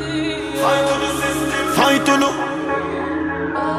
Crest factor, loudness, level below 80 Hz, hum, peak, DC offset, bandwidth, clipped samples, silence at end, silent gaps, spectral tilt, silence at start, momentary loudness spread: 16 dB; -18 LUFS; -44 dBFS; none; -2 dBFS; under 0.1%; 15.5 kHz; under 0.1%; 0 s; none; -4 dB/octave; 0 s; 8 LU